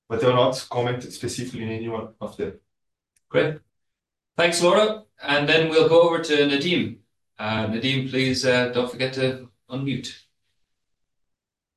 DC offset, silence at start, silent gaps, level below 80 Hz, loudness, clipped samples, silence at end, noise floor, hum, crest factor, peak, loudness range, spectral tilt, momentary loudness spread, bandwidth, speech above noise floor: under 0.1%; 0.1 s; none; -58 dBFS; -22 LUFS; under 0.1%; 1.6 s; -82 dBFS; none; 18 dB; -6 dBFS; 9 LU; -4.5 dB/octave; 15 LU; 12.5 kHz; 60 dB